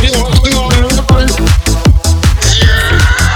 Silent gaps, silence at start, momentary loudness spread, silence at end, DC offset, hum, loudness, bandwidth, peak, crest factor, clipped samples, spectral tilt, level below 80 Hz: none; 0 s; 2 LU; 0 s; under 0.1%; none; -9 LUFS; 18 kHz; 0 dBFS; 8 dB; 0.3%; -4 dB/octave; -12 dBFS